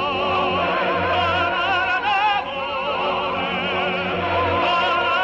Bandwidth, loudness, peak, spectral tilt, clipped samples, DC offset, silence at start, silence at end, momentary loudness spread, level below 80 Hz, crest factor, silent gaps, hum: 8.2 kHz; -20 LUFS; -8 dBFS; -5.5 dB/octave; under 0.1%; under 0.1%; 0 s; 0 s; 4 LU; -52 dBFS; 12 dB; none; none